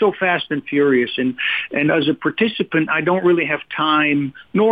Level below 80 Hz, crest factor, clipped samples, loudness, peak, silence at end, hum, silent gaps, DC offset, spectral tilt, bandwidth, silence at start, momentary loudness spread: -62 dBFS; 12 dB; under 0.1%; -18 LUFS; -6 dBFS; 0 s; none; none; under 0.1%; -8.5 dB/octave; 5 kHz; 0 s; 5 LU